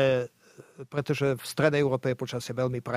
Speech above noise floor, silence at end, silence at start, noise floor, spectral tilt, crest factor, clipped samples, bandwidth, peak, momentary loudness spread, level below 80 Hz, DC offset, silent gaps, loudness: 20 dB; 0 s; 0 s; -47 dBFS; -6 dB/octave; 20 dB; under 0.1%; 16 kHz; -8 dBFS; 10 LU; -64 dBFS; under 0.1%; none; -28 LUFS